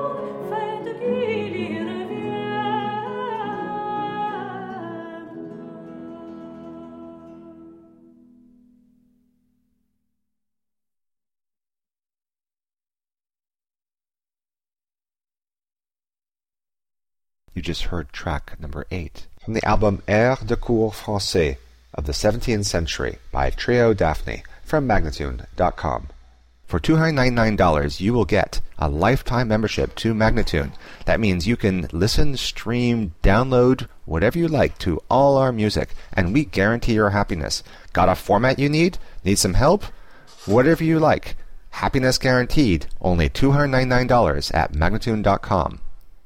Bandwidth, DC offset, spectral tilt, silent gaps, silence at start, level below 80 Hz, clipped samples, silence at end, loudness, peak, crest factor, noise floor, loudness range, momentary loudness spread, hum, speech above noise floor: 16 kHz; under 0.1%; -5.5 dB/octave; none; 0 s; -32 dBFS; under 0.1%; 0.05 s; -21 LUFS; -6 dBFS; 16 dB; under -90 dBFS; 13 LU; 16 LU; none; over 71 dB